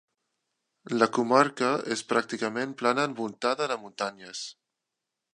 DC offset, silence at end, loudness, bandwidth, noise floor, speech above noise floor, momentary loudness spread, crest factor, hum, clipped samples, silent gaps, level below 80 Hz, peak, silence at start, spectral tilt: under 0.1%; 0.85 s; -27 LUFS; 11 kHz; -86 dBFS; 58 dB; 12 LU; 24 dB; none; under 0.1%; none; -82 dBFS; -4 dBFS; 0.85 s; -4 dB/octave